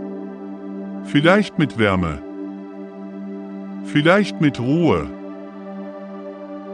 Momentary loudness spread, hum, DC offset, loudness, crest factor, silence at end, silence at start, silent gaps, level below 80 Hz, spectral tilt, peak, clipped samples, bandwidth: 18 LU; none; under 0.1%; -19 LUFS; 20 dB; 0 s; 0 s; none; -50 dBFS; -7 dB/octave; 0 dBFS; under 0.1%; 10.5 kHz